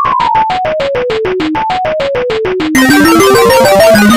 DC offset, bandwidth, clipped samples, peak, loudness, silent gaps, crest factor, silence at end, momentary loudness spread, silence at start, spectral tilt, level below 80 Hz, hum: 0.9%; over 20 kHz; 1%; 0 dBFS; -9 LUFS; none; 8 dB; 0 s; 8 LU; 0 s; -4 dB/octave; -34 dBFS; none